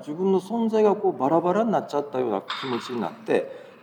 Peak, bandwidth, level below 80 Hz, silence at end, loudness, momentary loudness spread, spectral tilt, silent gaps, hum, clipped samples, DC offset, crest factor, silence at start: -8 dBFS; 12 kHz; -84 dBFS; 0.15 s; -24 LUFS; 8 LU; -6.5 dB/octave; none; none; under 0.1%; under 0.1%; 16 dB; 0 s